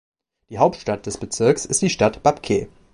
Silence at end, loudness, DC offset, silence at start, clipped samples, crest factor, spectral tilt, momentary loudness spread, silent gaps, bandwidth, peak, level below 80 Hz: 0.25 s; -20 LUFS; under 0.1%; 0.5 s; under 0.1%; 20 dB; -4.5 dB/octave; 9 LU; none; 11.5 kHz; -2 dBFS; -48 dBFS